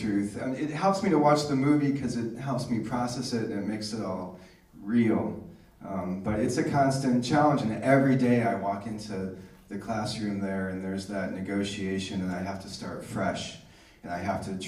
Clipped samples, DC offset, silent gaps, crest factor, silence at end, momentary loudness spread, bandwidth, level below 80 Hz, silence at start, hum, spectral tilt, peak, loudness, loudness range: under 0.1%; under 0.1%; none; 20 dB; 0 s; 14 LU; 14 kHz; -58 dBFS; 0 s; none; -6 dB/octave; -8 dBFS; -28 LUFS; 7 LU